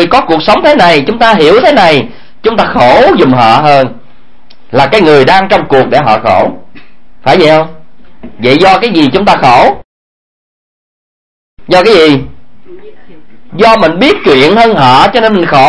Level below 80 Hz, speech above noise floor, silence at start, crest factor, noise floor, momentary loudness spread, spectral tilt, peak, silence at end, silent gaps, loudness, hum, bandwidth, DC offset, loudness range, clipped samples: -36 dBFS; 38 dB; 0 s; 8 dB; -43 dBFS; 8 LU; -5.5 dB/octave; 0 dBFS; 0 s; 9.85-11.57 s; -6 LUFS; none; 11 kHz; 6%; 4 LU; 5%